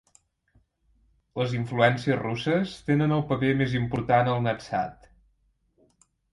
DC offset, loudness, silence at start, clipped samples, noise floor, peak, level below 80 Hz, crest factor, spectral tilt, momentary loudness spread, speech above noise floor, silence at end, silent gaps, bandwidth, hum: under 0.1%; -26 LUFS; 1.35 s; under 0.1%; -69 dBFS; -6 dBFS; -56 dBFS; 22 dB; -7.5 dB/octave; 8 LU; 44 dB; 1.4 s; none; 11.5 kHz; none